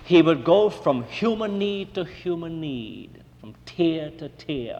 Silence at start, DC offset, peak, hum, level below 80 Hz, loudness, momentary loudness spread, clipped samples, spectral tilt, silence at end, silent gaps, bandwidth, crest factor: 0 s; under 0.1%; -4 dBFS; none; -54 dBFS; -24 LUFS; 19 LU; under 0.1%; -7 dB/octave; 0 s; none; 8.2 kHz; 18 dB